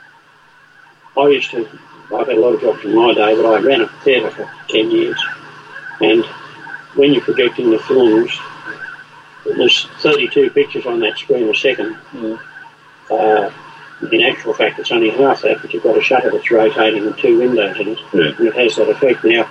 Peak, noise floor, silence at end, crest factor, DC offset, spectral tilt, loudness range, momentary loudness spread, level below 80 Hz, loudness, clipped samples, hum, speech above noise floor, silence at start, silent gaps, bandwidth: -2 dBFS; -47 dBFS; 0 s; 14 dB; under 0.1%; -5 dB/octave; 3 LU; 15 LU; -60 dBFS; -14 LUFS; under 0.1%; none; 33 dB; 1.15 s; none; 8.4 kHz